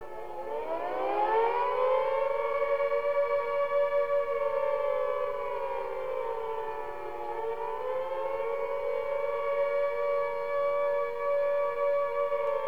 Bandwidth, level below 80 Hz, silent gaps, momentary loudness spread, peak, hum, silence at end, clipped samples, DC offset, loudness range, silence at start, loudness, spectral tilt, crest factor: 5.4 kHz; -62 dBFS; none; 7 LU; -16 dBFS; none; 0 s; under 0.1%; 0.8%; 6 LU; 0 s; -30 LUFS; -5 dB/octave; 14 dB